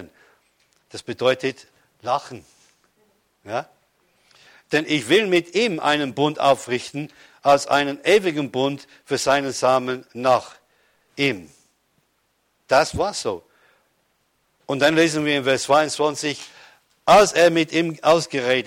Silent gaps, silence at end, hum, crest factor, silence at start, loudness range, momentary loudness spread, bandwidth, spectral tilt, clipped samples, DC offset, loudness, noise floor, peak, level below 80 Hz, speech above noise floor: none; 0 s; none; 18 dB; 0 s; 9 LU; 17 LU; 16.5 kHz; -4 dB/octave; under 0.1%; under 0.1%; -20 LUFS; -68 dBFS; -4 dBFS; -56 dBFS; 48 dB